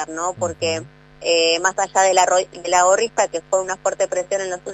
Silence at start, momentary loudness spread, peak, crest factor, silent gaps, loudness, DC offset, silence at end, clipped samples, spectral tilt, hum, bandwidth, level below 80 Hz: 0 s; 9 LU; -2 dBFS; 18 dB; none; -19 LUFS; under 0.1%; 0 s; under 0.1%; -1.5 dB/octave; 50 Hz at -50 dBFS; 13 kHz; -56 dBFS